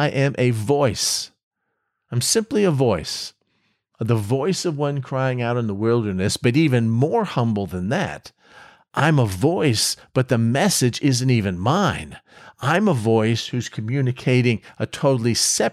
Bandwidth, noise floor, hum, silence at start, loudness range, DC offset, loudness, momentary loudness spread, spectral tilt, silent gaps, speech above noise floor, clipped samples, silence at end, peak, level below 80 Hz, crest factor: 15.5 kHz; -75 dBFS; none; 0 s; 3 LU; under 0.1%; -20 LUFS; 9 LU; -5 dB/octave; 1.43-1.51 s; 55 dB; under 0.1%; 0 s; -6 dBFS; -54 dBFS; 14 dB